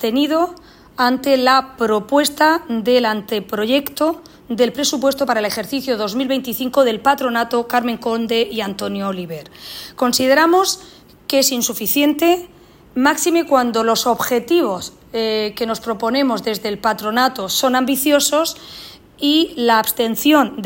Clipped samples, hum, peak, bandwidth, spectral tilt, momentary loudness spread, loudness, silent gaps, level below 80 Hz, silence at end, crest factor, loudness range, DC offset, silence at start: under 0.1%; none; 0 dBFS; 16.5 kHz; -3 dB/octave; 9 LU; -17 LUFS; none; -54 dBFS; 0 s; 16 dB; 3 LU; under 0.1%; 0 s